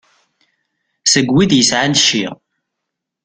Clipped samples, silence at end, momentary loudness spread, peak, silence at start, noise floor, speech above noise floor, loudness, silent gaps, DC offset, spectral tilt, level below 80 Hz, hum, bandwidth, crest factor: under 0.1%; 0.9 s; 8 LU; 0 dBFS; 1.05 s; -78 dBFS; 65 dB; -12 LUFS; none; under 0.1%; -3 dB/octave; -50 dBFS; none; 10 kHz; 16 dB